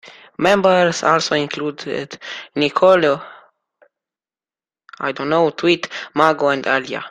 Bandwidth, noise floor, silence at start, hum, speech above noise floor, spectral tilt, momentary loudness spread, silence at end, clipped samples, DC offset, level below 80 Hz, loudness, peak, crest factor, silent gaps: 11.5 kHz; under -90 dBFS; 0.05 s; none; over 73 dB; -4.5 dB/octave; 13 LU; 0 s; under 0.1%; under 0.1%; -60 dBFS; -17 LUFS; 0 dBFS; 18 dB; none